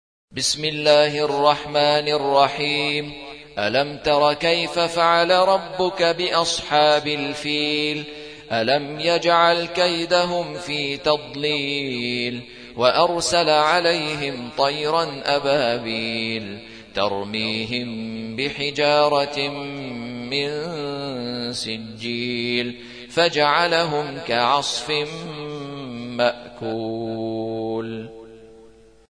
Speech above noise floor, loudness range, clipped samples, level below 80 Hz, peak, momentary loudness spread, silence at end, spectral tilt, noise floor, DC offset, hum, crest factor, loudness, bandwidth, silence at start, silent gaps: 28 dB; 7 LU; under 0.1%; -56 dBFS; -2 dBFS; 13 LU; 0.45 s; -3.5 dB/octave; -49 dBFS; 0.1%; none; 20 dB; -21 LUFS; 10.5 kHz; 0.35 s; none